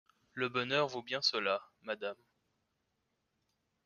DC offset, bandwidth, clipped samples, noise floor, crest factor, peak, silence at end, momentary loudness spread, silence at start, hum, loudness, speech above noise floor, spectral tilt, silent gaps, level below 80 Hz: under 0.1%; 7.2 kHz; under 0.1%; -82 dBFS; 22 dB; -18 dBFS; 1.7 s; 12 LU; 0.35 s; none; -35 LUFS; 47 dB; -3.5 dB/octave; none; -82 dBFS